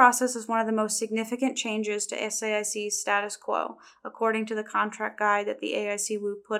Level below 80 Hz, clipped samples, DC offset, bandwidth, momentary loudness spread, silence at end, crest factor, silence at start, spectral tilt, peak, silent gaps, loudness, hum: -86 dBFS; under 0.1%; under 0.1%; 17.5 kHz; 5 LU; 0 s; 24 dB; 0 s; -2 dB/octave; -4 dBFS; none; -28 LUFS; none